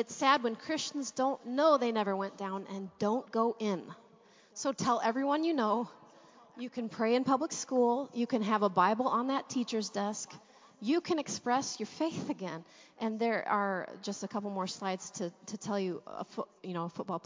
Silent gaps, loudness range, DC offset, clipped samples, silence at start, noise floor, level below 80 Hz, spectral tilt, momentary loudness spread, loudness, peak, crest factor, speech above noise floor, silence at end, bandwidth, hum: none; 5 LU; under 0.1%; under 0.1%; 0 s; -62 dBFS; -80 dBFS; -4.5 dB/octave; 12 LU; -33 LUFS; -12 dBFS; 20 dB; 29 dB; 0.05 s; 7.6 kHz; none